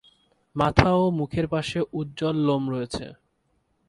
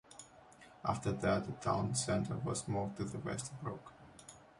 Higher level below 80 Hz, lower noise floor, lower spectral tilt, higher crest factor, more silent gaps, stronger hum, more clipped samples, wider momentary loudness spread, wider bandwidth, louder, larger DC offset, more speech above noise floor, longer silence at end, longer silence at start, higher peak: first, -42 dBFS vs -60 dBFS; first, -70 dBFS vs -60 dBFS; first, -7 dB/octave vs -5 dB/octave; first, 26 dB vs 18 dB; neither; neither; neither; second, 14 LU vs 21 LU; about the same, 11.5 kHz vs 11.5 kHz; first, -24 LUFS vs -38 LUFS; neither; first, 46 dB vs 22 dB; first, 0.75 s vs 0.15 s; first, 0.55 s vs 0.1 s; first, 0 dBFS vs -20 dBFS